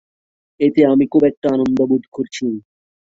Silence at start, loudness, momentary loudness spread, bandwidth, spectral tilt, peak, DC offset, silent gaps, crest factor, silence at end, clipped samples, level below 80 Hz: 0.6 s; -16 LUFS; 11 LU; 7.8 kHz; -7 dB/octave; -2 dBFS; under 0.1%; 1.37-1.42 s, 2.08-2.12 s; 16 dB; 0.45 s; under 0.1%; -56 dBFS